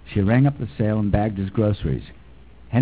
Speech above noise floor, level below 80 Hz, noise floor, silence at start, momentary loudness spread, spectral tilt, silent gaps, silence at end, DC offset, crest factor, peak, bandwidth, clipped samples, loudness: 26 dB; -36 dBFS; -46 dBFS; 0.05 s; 8 LU; -12.5 dB/octave; none; 0 s; 0.4%; 16 dB; -6 dBFS; 4 kHz; under 0.1%; -22 LUFS